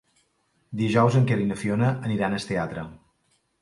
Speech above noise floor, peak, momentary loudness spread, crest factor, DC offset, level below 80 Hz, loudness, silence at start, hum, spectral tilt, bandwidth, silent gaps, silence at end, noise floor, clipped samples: 46 dB; -6 dBFS; 15 LU; 18 dB; under 0.1%; -56 dBFS; -24 LUFS; 0.7 s; none; -7 dB/octave; 11.5 kHz; none; 0.65 s; -69 dBFS; under 0.1%